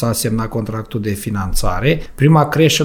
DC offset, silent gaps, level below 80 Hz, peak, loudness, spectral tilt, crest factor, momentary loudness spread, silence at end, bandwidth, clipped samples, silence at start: under 0.1%; none; -26 dBFS; -2 dBFS; -17 LUFS; -5.5 dB/octave; 14 dB; 10 LU; 0 s; 19.5 kHz; under 0.1%; 0 s